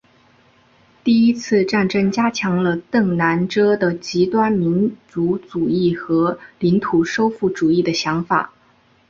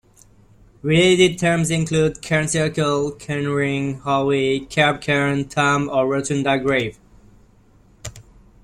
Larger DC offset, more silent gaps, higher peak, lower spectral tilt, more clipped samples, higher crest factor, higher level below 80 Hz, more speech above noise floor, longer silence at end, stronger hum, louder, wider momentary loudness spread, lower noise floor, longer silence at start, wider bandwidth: neither; neither; about the same, -2 dBFS vs -2 dBFS; first, -6.5 dB/octave vs -5 dB/octave; neither; about the same, 16 dB vs 18 dB; second, -54 dBFS vs -48 dBFS; first, 38 dB vs 33 dB; first, 0.6 s vs 0.45 s; neither; about the same, -18 LUFS vs -19 LUFS; second, 5 LU vs 9 LU; about the same, -55 dBFS vs -52 dBFS; first, 1.05 s vs 0.85 s; second, 7.4 kHz vs 13.5 kHz